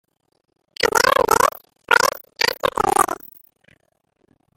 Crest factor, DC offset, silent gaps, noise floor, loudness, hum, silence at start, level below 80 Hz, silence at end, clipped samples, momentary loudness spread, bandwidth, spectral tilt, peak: 22 dB; under 0.1%; none; -67 dBFS; -18 LUFS; none; 0.8 s; -50 dBFS; 1.45 s; under 0.1%; 6 LU; 17 kHz; -1.5 dB/octave; 0 dBFS